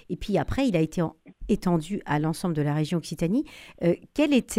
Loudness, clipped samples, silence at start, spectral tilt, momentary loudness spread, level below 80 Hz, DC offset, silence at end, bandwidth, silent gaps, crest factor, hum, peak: -26 LUFS; under 0.1%; 0.1 s; -6.5 dB/octave; 5 LU; -44 dBFS; under 0.1%; 0 s; 15.5 kHz; none; 16 dB; none; -10 dBFS